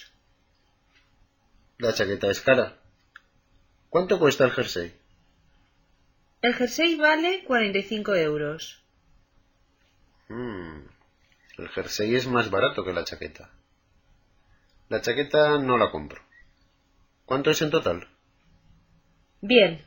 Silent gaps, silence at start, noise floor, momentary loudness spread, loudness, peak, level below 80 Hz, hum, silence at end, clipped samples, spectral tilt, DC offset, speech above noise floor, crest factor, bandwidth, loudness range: none; 0 s; -66 dBFS; 17 LU; -24 LUFS; -4 dBFS; -58 dBFS; none; 0.05 s; under 0.1%; -4.5 dB/octave; under 0.1%; 42 dB; 24 dB; 17 kHz; 6 LU